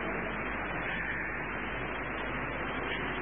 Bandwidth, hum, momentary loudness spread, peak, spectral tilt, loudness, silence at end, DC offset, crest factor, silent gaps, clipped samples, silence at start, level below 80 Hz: 3.7 kHz; none; 2 LU; -20 dBFS; -1 dB/octave; -34 LUFS; 0 s; 0.3%; 14 dB; none; under 0.1%; 0 s; -48 dBFS